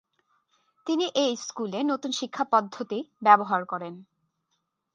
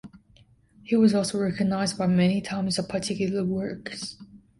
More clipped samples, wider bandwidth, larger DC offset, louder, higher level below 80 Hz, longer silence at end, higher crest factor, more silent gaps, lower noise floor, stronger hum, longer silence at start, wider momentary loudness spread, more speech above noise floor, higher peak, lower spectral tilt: neither; second, 9.6 kHz vs 11.5 kHz; neither; about the same, -26 LUFS vs -25 LUFS; second, -82 dBFS vs -58 dBFS; first, 0.9 s vs 0.2 s; first, 24 dB vs 18 dB; neither; first, -78 dBFS vs -58 dBFS; neither; first, 0.85 s vs 0.05 s; about the same, 14 LU vs 12 LU; first, 52 dB vs 33 dB; first, -4 dBFS vs -8 dBFS; second, -3.5 dB/octave vs -5.5 dB/octave